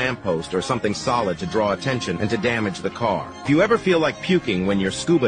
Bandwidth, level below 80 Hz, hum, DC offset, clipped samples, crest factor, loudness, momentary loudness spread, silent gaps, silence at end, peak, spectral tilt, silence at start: 10 kHz; -50 dBFS; none; under 0.1%; under 0.1%; 14 dB; -22 LUFS; 6 LU; none; 0 s; -6 dBFS; -5.5 dB/octave; 0 s